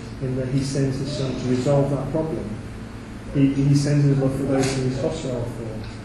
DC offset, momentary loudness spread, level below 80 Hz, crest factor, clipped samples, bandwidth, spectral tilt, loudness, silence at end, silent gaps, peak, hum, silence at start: under 0.1%; 14 LU; -40 dBFS; 16 dB; under 0.1%; 12 kHz; -7 dB/octave; -23 LUFS; 0 s; none; -6 dBFS; none; 0 s